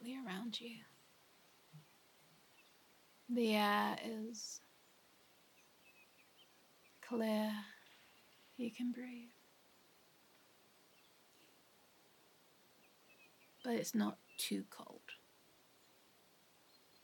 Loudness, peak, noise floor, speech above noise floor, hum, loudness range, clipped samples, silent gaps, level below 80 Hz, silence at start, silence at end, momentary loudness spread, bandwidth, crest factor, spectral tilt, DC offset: -42 LUFS; -24 dBFS; -70 dBFS; 29 dB; none; 10 LU; under 0.1%; none; under -90 dBFS; 0 s; 1.85 s; 28 LU; 17.5 kHz; 22 dB; -4 dB/octave; under 0.1%